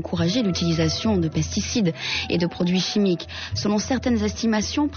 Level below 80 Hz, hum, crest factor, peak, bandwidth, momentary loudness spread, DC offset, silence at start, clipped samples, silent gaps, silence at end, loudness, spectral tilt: -44 dBFS; none; 12 dB; -10 dBFS; 6.8 kHz; 3 LU; under 0.1%; 0 s; under 0.1%; none; 0 s; -23 LUFS; -5 dB/octave